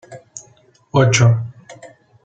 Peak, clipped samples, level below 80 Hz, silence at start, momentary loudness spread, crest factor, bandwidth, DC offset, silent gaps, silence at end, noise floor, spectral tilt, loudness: 0 dBFS; under 0.1%; -50 dBFS; 0.1 s; 24 LU; 18 dB; 8.8 kHz; under 0.1%; none; 0.4 s; -52 dBFS; -5 dB/octave; -15 LUFS